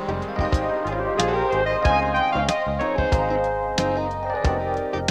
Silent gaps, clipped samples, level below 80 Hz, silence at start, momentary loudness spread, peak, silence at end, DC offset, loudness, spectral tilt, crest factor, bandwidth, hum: none; under 0.1%; -32 dBFS; 0 s; 5 LU; -4 dBFS; 0 s; under 0.1%; -23 LUFS; -5.5 dB/octave; 18 dB; 11.5 kHz; none